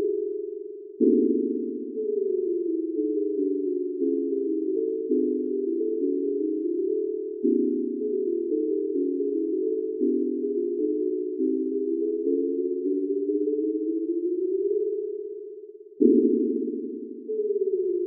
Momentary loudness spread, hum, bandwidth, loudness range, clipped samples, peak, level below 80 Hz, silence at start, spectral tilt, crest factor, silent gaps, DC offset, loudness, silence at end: 8 LU; none; 0.6 kHz; 1 LU; under 0.1%; -6 dBFS; under -90 dBFS; 0 s; -17.5 dB/octave; 20 dB; none; under 0.1%; -26 LUFS; 0 s